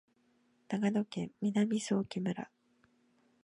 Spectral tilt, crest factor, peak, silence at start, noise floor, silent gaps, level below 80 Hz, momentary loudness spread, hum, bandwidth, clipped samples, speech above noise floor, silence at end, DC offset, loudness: -6 dB/octave; 18 dB; -20 dBFS; 0.7 s; -72 dBFS; none; -76 dBFS; 8 LU; none; 11 kHz; under 0.1%; 38 dB; 1 s; under 0.1%; -35 LUFS